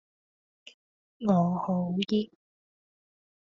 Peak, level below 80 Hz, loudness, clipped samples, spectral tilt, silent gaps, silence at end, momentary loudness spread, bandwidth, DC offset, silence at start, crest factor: -12 dBFS; -72 dBFS; -28 LUFS; under 0.1%; -7 dB/octave; none; 1.25 s; 7 LU; 7.2 kHz; under 0.1%; 1.2 s; 20 dB